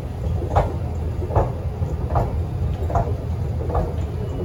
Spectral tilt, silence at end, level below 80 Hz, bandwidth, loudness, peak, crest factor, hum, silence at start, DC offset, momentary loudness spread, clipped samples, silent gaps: -9 dB/octave; 0 s; -28 dBFS; 15.5 kHz; -24 LUFS; -4 dBFS; 18 dB; none; 0 s; under 0.1%; 5 LU; under 0.1%; none